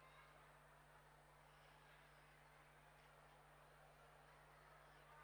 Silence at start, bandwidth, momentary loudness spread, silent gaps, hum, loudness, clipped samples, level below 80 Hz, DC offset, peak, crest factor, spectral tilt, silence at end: 0 s; 19 kHz; 2 LU; none; none; -68 LUFS; under 0.1%; -80 dBFS; under 0.1%; -54 dBFS; 14 dB; -4 dB/octave; 0 s